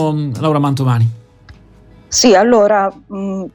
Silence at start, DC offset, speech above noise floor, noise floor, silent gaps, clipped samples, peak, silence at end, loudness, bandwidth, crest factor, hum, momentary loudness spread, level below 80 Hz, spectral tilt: 0 s; under 0.1%; 30 dB; -43 dBFS; none; under 0.1%; 0 dBFS; 0.05 s; -13 LUFS; 16 kHz; 14 dB; none; 12 LU; -46 dBFS; -5 dB/octave